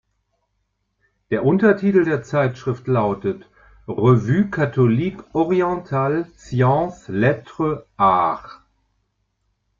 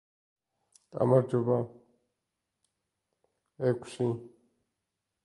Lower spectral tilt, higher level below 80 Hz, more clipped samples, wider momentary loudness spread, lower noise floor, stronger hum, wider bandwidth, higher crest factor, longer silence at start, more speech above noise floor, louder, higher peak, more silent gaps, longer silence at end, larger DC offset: about the same, -9 dB/octave vs -8.5 dB/octave; first, -52 dBFS vs -72 dBFS; neither; second, 9 LU vs 15 LU; second, -72 dBFS vs -85 dBFS; first, 50 Hz at -45 dBFS vs none; second, 7.4 kHz vs 11.5 kHz; about the same, 18 dB vs 22 dB; first, 1.3 s vs 0.95 s; second, 53 dB vs 57 dB; first, -19 LUFS vs -30 LUFS; first, -2 dBFS vs -10 dBFS; neither; first, 1.25 s vs 0.95 s; neither